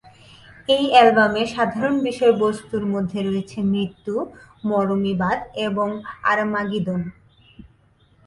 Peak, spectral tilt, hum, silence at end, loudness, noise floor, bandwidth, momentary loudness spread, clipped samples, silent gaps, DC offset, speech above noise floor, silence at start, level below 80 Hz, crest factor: 0 dBFS; -6 dB/octave; none; 1.15 s; -20 LUFS; -57 dBFS; 11.5 kHz; 12 LU; under 0.1%; none; under 0.1%; 37 dB; 0.7 s; -54 dBFS; 20 dB